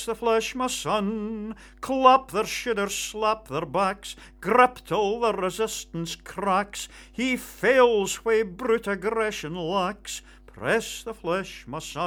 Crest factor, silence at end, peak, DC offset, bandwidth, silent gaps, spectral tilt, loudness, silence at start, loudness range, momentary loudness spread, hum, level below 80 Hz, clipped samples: 24 dB; 0 s; -2 dBFS; under 0.1%; over 20 kHz; none; -3.5 dB/octave; -25 LUFS; 0 s; 3 LU; 15 LU; none; -52 dBFS; under 0.1%